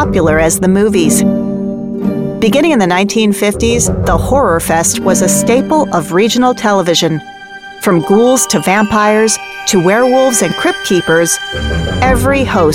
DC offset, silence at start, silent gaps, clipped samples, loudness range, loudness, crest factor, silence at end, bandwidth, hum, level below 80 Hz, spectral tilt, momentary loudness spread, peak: under 0.1%; 0 s; none; under 0.1%; 1 LU; -11 LUFS; 10 dB; 0 s; 17 kHz; none; -28 dBFS; -4 dB/octave; 7 LU; 0 dBFS